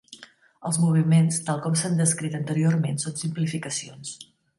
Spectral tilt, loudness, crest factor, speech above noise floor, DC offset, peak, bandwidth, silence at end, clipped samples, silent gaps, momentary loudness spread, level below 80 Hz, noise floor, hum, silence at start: -5.5 dB/octave; -24 LUFS; 16 dB; 27 dB; under 0.1%; -8 dBFS; 11.5 kHz; 0.35 s; under 0.1%; none; 16 LU; -68 dBFS; -50 dBFS; none; 0.1 s